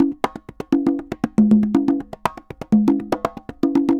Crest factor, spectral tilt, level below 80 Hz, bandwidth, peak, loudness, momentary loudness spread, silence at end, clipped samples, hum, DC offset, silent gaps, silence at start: 16 dB; -8 dB/octave; -50 dBFS; 11 kHz; -4 dBFS; -20 LUFS; 12 LU; 0 s; under 0.1%; none; under 0.1%; none; 0 s